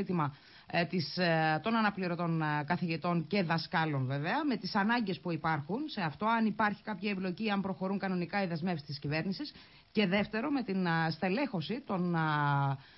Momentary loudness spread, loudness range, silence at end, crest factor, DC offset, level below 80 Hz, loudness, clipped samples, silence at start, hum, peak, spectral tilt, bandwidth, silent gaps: 6 LU; 3 LU; 0.15 s; 16 dB; under 0.1%; -68 dBFS; -33 LUFS; under 0.1%; 0 s; none; -18 dBFS; -4.5 dB/octave; 5.8 kHz; none